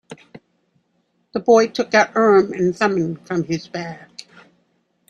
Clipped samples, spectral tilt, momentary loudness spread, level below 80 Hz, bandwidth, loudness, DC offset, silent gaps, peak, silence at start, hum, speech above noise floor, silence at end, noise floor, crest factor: under 0.1%; -5.5 dB/octave; 18 LU; -62 dBFS; 9.6 kHz; -18 LUFS; under 0.1%; none; -2 dBFS; 0.1 s; none; 49 dB; 0.9 s; -67 dBFS; 18 dB